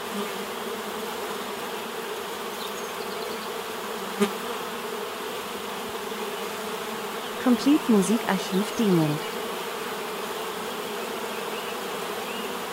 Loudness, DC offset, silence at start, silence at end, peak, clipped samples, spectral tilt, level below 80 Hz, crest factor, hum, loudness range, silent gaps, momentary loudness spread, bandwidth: -28 LUFS; under 0.1%; 0 s; 0 s; -8 dBFS; under 0.1%; -4.5 dB/octave; -66 dBFS; 20 dB; none; 7 LU; none; 10 LU; 16 kHz